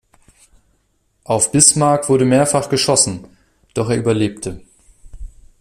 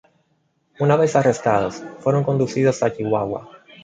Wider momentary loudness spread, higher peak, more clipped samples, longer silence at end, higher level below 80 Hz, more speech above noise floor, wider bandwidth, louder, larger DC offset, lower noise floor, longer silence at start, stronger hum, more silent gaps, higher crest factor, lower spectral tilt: first, 16 LU vs 9 LU; about the same, 0 dBFS vs -2 dBFS; neither; about the same, 0.35 s vs 0.25 s; first, -44 dBFS vs -56 dBFS; about the same, 48 dB vs 47 dB; first, 15.5 kHz vs 9.2 kHz; first, -14 LUFS vs -20 LUFS; neither; about the same, -63 dBFS vs -66 dBFS; first, 1.3 s vs 0.8 s; neither; neither; about the same, 18 dB vs 18 dB; second, -4 dB/octave vs -6.5 dB/octave